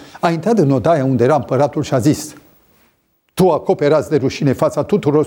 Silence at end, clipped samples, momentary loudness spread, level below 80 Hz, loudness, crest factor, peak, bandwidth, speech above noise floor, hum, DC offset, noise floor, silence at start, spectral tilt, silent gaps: 0 s; under 0.1%; 4 LU; -50 dBFS; -15 LUFS; 14 dB; 0 dBFS; 19 kHz; 47 dB; none; under 0.1%; -61 dBFS; 0 s; -7 dB/octave; none